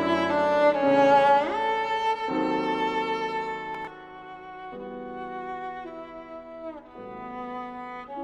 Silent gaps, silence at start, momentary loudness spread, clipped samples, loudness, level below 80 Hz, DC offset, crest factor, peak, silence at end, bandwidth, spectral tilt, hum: none; 0 s; 20 LU; under 0.1%; -25 LUFS; -62 dBFS; under 0.1%; 18 dB; -8 dBFS; 0 s; 9.4 kHz; -5.5 dB/octave; none